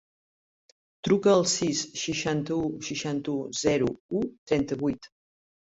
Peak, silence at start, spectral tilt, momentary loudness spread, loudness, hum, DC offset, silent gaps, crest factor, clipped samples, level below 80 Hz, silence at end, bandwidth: -10 dBFS; 1.05 s; -4.5 dB/octave; 10 LU; -27 LUFS; none; under 0.1%; 4.00-4.09 s, 4.38-4.47 s; 18 dB; under 0.1%; -58 dBFS; 0.75 s; 8 kHz